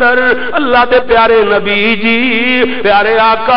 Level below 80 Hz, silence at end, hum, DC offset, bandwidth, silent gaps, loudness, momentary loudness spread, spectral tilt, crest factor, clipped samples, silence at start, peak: -36 dBFS; 0 s; none; 8%; 5.6 kHz; none; -9 LUFS; 3 LU; -8 dB/octave; 8 dB; under 0.1%; 0 s; -2 dBFS